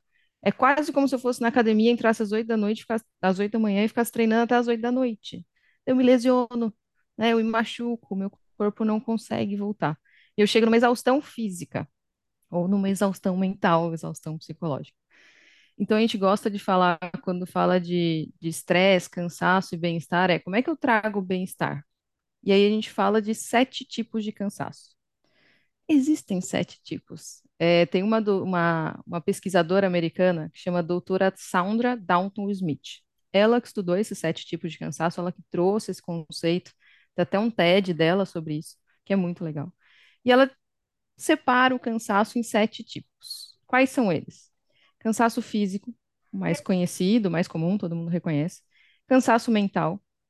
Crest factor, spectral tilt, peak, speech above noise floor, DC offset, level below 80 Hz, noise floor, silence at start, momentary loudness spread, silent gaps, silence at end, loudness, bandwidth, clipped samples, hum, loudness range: 20 dB; -5.5 dB/octave; -6 dBFS; 60 dB; under 0.1%; -70 dBFS; -84 dBFS; 0.45 s; 13 LU; none; 0.3 s; -24 LUFS; 12.5 kHz; under 0.1%; none; 4 LU